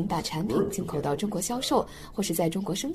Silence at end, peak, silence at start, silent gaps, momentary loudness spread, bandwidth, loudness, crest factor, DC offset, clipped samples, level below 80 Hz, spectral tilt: 0 s; -10 dBFS; 0 s; none; 4 LU; 14.5 kHz; -29 LUFS; 18 dB; under 0.1%; under 0.1%; -50 dBFS; -4.5 dB/octave